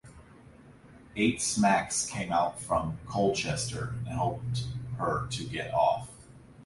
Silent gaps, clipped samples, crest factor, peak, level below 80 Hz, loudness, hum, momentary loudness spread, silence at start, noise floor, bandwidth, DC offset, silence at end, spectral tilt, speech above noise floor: none; under 0.1%; 20 dB; -12 dBFS; -52 dBFS; -30 LUFS; none; 9 LU; 0.05 s; -53 dBFS; 11.5 kHz; under 0.1%; 0 s; -4.5 dB/octave; 24 dB